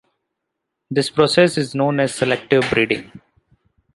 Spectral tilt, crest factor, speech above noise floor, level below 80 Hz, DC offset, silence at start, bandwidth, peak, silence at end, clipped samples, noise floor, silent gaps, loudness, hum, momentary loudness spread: -5 dB/octave; 18 dB; 61 dB; -54 dBFS; under 0.1%; 0.9 s; 11.5 kHz; 0 dBFS; 0.8 s; under 0.1%; -78 dBFS; none; -18 LUFS; none; 7 LU